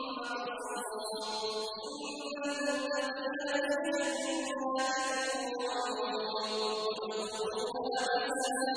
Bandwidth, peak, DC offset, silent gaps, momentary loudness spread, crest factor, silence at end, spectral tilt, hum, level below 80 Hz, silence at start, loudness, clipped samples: 11 kHz; -20 dBFS; under 0.1%; none; 6 LU; 16 dB; 0 s; -1.5 dB/octave; none; -74 dBFS; 0 s; -34 LUFS; under 0.1%